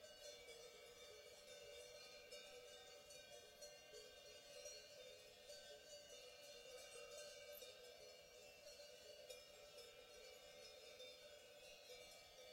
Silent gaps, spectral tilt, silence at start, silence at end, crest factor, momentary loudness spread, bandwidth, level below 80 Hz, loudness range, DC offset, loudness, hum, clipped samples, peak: none; -0.5 dB/octave; 0 s; 0 s; 20 dB; 4 LU; 16 kHz; -84 dBFS; 2 LU; under 0.1%; -60 LUFS; none; under 0.1%; -42 dBFS